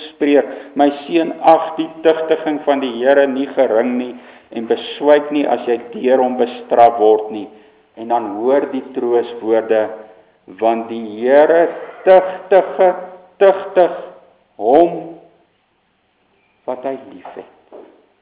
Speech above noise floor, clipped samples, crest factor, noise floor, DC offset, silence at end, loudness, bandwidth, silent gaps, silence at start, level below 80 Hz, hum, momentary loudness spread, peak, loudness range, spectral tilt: 47 dB; 0.2%; 16 dB; -62 dBFS; under 0.1%; 0.4 s; -15 LUFS; 4 kHz; none; 0 s; -66 dBFS; none; 16 LU; 0 dBFS; 5 LU; -9 dB/octave